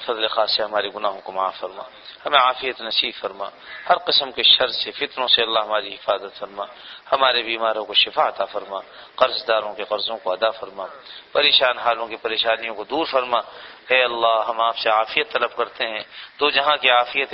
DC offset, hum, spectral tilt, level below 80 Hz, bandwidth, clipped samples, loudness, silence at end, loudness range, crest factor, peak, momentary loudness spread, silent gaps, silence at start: under 0.1%; none; -4.5 dB/octave; -62 dBFS; 6 kHz; under 0.1%; -20 LUFS; 0 s; 3 LU; 20 dB; -2 dBFS; 17 LU; none; 0 s